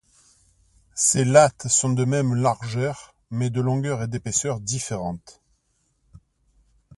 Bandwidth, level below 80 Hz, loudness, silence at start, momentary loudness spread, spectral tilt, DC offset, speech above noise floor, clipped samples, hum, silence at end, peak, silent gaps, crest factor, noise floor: 11.5 kHz; -54 dBFS; -22 LUFS; 0.95 s; 15 LU; -4.5 dB/octave; under 0.1%; 47 dB; under 0.1%; none; 1.65 s; -2 dBFS; none; 22 dB; -69 dBFS